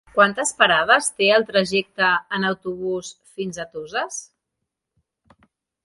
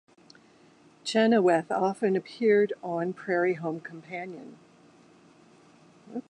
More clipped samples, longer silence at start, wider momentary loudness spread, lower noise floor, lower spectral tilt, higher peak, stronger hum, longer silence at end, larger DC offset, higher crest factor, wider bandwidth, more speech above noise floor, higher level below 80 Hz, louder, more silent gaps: neither; second, 0.15 s vs 1.05 s; about the same, 14 LU vs 16 LU; first, -81 dBFS vs -58 dBFS; second, -2.5 dB/octave vs -6 dB/octave; first, 0 dBFS vs -10 dBFS; neither; first, 1.6 s vs 0.1 s; neither; about the same, 22 dB vs 18 dB; about the same, 11.5 kHz vs 10.5 kHz; first, 60 dB vs 31 dB; first, -62 dBFS vs -80 dBFS; first, -20 LUFS vs -27 LUFS; neither